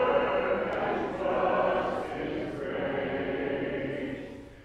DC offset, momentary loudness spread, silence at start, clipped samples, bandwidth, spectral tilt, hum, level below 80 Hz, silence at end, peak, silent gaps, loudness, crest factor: under 0.1%; 8 LU; 0 s; under 0.1%; 10 kHz; -7 dB/octave; none; -54 dBFS; 0 s; -14 dBFS; none; -30 LUFS; 16 dB